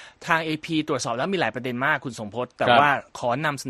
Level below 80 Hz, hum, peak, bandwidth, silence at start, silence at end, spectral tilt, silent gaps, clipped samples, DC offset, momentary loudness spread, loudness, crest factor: -62 dBFS; none; -2 dBFS; 13 kHz; 0 s; 0 s; -4.5 dB/octave; none; under 0.1%; under 0.1%; 9 LU; -23 LUFS; 22 dB